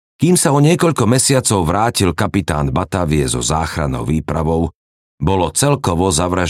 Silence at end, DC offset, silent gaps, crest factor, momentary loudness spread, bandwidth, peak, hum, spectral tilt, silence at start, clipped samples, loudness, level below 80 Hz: 0 s; under 0.1%; 4.75-5.18 s; 14 dB; 7 LU; 16 kHz; -2 dBFS; none; -5 dB/octave; 0.2 s; under 0.1%; -15 LUFS; -34 dBFS